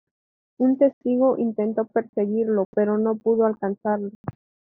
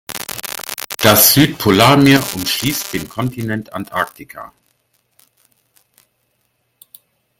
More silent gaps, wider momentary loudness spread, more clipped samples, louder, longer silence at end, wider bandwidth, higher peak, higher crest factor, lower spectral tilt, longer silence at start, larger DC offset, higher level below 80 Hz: first, 0.93-1.01 s, 2.09-2.13 s, 2.65-2.73 s, 4.15-4.24 s vs none; second, 7 LU vs 16 LU; neither; second, -22 LUFS vs -14 LUFS; second, 0.35 s vs 2.95 s; second, 3.1 kHz vs 19 kHz; second, -6 dBFS vs 0 dBFS; about the same, 16 dB vs 18 dB; first, -9.5 dB/octave vs -4 dB/octave; first, 0.6 s vs 0.1 s; neither; second, -68 dBFS vs -48 dBFS